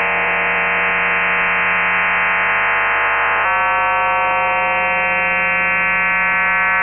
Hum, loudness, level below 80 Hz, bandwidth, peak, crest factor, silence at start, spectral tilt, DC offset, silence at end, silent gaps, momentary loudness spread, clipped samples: none; -14 LUFS; -46 dBFS; 3.3 kHz; -6 dBFS; 10 dB; 0 s; -6.5 dB/octave; under 0.1%; 0 s; none; 1 LU; under 0.1%